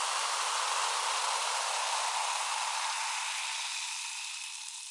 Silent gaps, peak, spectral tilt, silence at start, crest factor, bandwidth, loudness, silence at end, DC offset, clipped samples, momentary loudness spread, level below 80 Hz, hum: none; -20 dBFS; 8 dB/octave; 0 s; 14 dB; 11.5 kHz; -32 LUFS; 0 s; under 0.1%; under 0.1%; 7 LU; under -90 dBFS; none